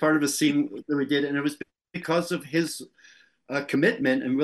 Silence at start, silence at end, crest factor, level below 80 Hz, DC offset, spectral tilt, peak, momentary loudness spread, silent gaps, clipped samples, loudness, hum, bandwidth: 0 s; 0 s; 16 dB; -72 dBFS; under 0.1%; -4.5 dB/octave; -10 dBFS; 11 LU; none; under 0.1%; -26 LUFS; none; 12.5 kHz